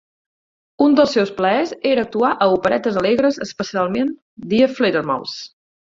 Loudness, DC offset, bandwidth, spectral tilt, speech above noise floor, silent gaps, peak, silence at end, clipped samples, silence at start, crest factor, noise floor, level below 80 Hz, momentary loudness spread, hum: -18 LUFS; under 0.1%; 7.6 kHz; -5.5 dB/octave; over 73 dB; 4.22-4.37 s; -2 dBFS; 0.4 s; under 0.1%; 0.8 s; 16 dB; under -90 dBFS; -56 dBFS; 9 LU; none